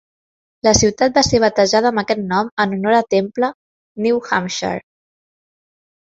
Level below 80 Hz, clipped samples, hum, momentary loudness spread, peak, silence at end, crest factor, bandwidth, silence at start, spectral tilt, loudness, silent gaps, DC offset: -42 dBFS; under 0.1%; none; 9 LU; 0 dBFS; 1.25 s; 18 dB; 8 kHz; 0.65 s; -3.5 dB/octave; -17 LUFS; 2.51-2.57 s, 3.55-3.95 s; under 0.1%